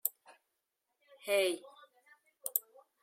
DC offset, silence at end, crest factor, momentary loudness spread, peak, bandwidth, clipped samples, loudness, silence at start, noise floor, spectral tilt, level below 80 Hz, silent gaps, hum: under 0.1%; 0.45 s; 28 dB; 13 LU; -12 dBFS; 16.5 kHz; under 0.1%; -35 LUFS; 0.05 s; -85 dBFS; -0.5 dB/octave; under -90 dBFS; none; none